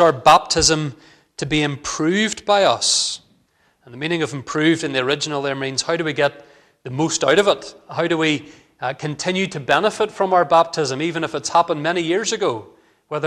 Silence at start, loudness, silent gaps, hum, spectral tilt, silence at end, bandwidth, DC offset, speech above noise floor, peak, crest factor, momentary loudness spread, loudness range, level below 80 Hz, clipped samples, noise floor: 0 s; -19 LUFS; none; none; -3.5 dB/octave; 0 s; 13.5 kHz; under 0.1%; 42 dB; -2 dBFS; 18 dB; 12 LU; 3 LU; -48 dBFS; under 0.1%; -61 dBFS